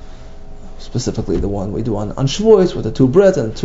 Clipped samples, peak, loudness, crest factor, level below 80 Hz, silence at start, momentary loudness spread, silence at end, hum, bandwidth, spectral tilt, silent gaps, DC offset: under 0.1%; 0 dBFS; -15 LUFS; 16 dB; -30 dBFS; 0 s; 10 LU; 0 s; none; 7.8 kHz; -6.5 dB/octave; none; under 0.1%